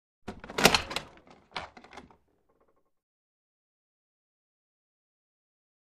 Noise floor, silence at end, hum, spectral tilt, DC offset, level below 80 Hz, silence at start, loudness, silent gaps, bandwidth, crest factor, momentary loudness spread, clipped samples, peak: -71 dBFS; 3.85 s; none; -2.5 dB/octave; under 0.1%; -58 dBFS; 0.25 s; -26 LUFS; none; 15 kHz; 32 dB; 23 LU; under 0.1%; -4 dBFS